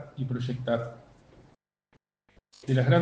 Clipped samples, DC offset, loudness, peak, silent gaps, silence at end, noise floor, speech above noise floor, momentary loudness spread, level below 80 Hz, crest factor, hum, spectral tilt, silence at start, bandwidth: under 0.1%; under 0.1%; -30 LUFS; -10 dBFS; none; 0 s; -69 dBFS; 43 dB; 16 LU; -62 dBFS; 20 dB; none; -8 dB/octave; 0 s; 7.6 kHz